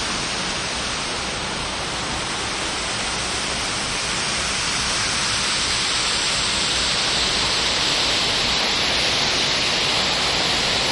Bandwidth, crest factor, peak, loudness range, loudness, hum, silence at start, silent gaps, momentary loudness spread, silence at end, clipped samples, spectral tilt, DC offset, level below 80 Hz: 11.5 kHz; 14 dB; -8 dBFS; 5 LU; -19 LUFS; none; 0 s; none; 6 LU; 0 s; under 0.1%; -1 dB/octave; under 0.1%; -40 dBFS